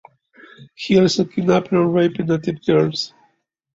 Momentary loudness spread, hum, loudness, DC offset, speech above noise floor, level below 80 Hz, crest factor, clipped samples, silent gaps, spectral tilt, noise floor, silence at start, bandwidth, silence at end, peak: 8 LU; none; -18 LUFS; under 0.1%; 45 dB; -56 dBFS; 16 dB; under 0.1%; none; -6 dB/octave; -63 dBFS; 0.6 s; 7.8 kHz; 0.75 s; -2 dBFS